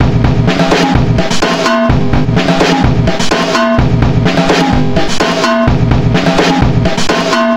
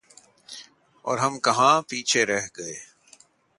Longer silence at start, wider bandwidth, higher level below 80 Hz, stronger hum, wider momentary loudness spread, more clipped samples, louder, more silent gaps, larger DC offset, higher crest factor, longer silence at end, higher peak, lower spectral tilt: second, 0 s vs 0.5 s; first, 15 kHz vs 11.5 kHz; first, -22 dBFS vs -70 dBFS; neither; second, 2 LU vs 22 LU; first, 0.1% vs under 0.1%; first, -10 LUFS vs -22 LUFS; neither; neither; second, 10 dB vs 20 dB; second, 0 s vs 0.75 s; first, 0 dBFS vs -6 dBFS; first, -5.5 dB/octave vs -2.5 dB/octave